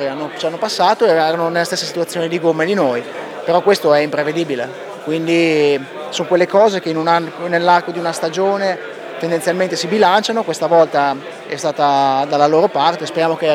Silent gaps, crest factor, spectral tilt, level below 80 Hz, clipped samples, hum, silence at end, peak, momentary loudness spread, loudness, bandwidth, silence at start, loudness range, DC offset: none; 16 dB; -4.5 dB/octave; -70 dBFS; under 0.1%; none; 0 s; 0 dBFS; 10 LU; -16 LUFS; 16.5 kHz; 0 s; 2 LU; under 0.1%